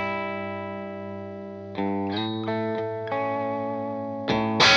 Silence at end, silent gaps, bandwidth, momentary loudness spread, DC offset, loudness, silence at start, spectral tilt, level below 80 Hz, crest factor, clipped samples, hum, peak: 0 s; none; 10 kHz; 10 LU; under 0.1%; -28 LUFS; 0 s; -4 dB/octave; -60 dBFS; 20 dB; under 0.1%; 50 Hz at -50 dBFS; -6 dBFS